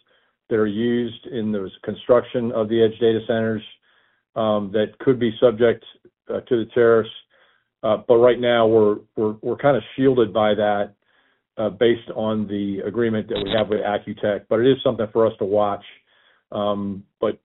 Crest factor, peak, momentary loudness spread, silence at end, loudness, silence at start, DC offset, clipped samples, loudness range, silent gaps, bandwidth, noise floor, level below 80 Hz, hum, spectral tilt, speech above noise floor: 18 dB; -2 dBFS; 11 LU; 0.1 s; -21 LUFS; 0.5 s; under 0.1%; under 0.1%; 4 LU; none; 4.1 kHz; -64 dBFS; -54 dBFS; none; -5 dB/octave; 44 dB